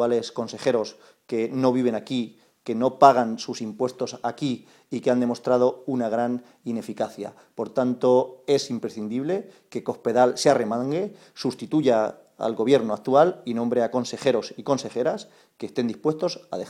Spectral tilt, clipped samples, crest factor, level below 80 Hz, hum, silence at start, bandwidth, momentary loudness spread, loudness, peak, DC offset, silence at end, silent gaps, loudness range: -5.5 dB/octave; under 0.1%; 24 dB; -70 dBFS; none; 0 s; 13 kHz; 12 LU; -24 LUFS; 0 dBFS; under 0.1%; 0 s; none; 3 LU